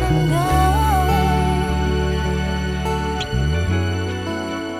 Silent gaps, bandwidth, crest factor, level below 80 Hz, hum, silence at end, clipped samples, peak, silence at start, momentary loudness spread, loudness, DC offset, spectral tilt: none; 15.5 kHz; 14 dB; -24 dBFS; none; 0 s; under 0.1%; -4 dBFS; 0 s; 7 LU; -20 LUFS; under 0.1%; -6 dB/octave